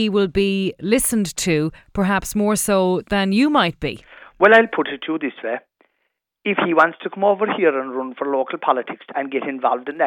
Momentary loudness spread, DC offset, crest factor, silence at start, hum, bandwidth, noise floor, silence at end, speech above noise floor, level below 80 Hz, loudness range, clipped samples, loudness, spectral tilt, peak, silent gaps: 11 LU; under 0.1%; 18 dB; 0 s; none; 18 kHz; -73 dBFS; 0 s; 54 dB; -46 dBFS; 3 LU; under 0.1%; -19 LUFS; -4.5 dB/octave; -2 dBFS; none